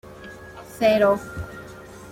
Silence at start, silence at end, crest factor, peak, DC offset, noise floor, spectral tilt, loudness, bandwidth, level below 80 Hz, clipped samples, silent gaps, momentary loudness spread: 0.05 s; 0 s; 18 dB; -6 dBFS; under 0.1%; -41 dBFS; -5.5 dB/octave; -20 LUFS; 16.5 kHz; -48 dBFS; under 0.1%; none; 23 LU